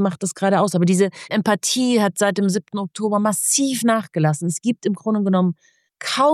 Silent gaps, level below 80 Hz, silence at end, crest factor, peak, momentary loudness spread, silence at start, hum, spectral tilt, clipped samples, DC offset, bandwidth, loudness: none; -76 dBFS; 0 s; 16 dB; -4 dBFS; 6 LU; 0 s; none; -4.5 dB/octave; under 0.1%; under 0.1%; 14.5 kHz; -19 LUFS